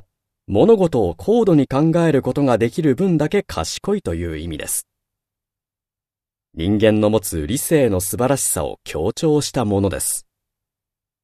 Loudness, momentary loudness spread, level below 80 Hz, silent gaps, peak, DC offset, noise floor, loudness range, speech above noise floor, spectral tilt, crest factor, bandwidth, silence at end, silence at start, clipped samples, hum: -18 LUFS; 10 LU; -42 dBFS; none; 0 dBFS; under 0.1%; -90 dBFS; 7 LU; 72 dB; -5.5 dB/octave; 18 dB; 14 kHz; 1.05 s; 0.5 s; under 0.1%; none